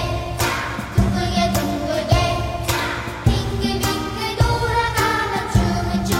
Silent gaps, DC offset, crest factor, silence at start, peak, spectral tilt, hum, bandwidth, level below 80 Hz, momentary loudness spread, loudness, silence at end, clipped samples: none; under 0.1%; 14 dB; 0 s; -6 dBFS; -5 dB/octave; none; 16.5 kHz; -28 dBFS; 4 LU; -20 LUFS; 0 s; under 0.1%